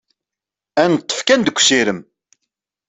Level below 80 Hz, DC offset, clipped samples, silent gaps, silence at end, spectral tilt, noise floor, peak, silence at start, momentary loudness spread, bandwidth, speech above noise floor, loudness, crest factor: -62 dBFS; under 0.1%; under 0.1%; none; 0.85 s; -2.5 dB/octave; -87 dBFS; 0 dBFS; 0.75 s; 9 LU; 8.4 kHz; 72 dB; -15 LUFS; 18 dB